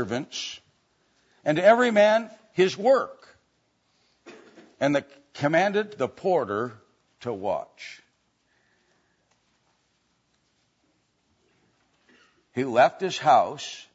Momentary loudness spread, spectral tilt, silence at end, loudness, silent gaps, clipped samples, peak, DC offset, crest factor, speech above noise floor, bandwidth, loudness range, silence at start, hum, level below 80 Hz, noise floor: 17 LU; -5 dB/octave; 0.15 s; -24 LUFS; none; under 0.1%; -4 dBFS; under 0.1%; 22 dB; 47 dB; 8 kHz; 14 LU; 0 s; none; -74 dBFS; -70 dBFS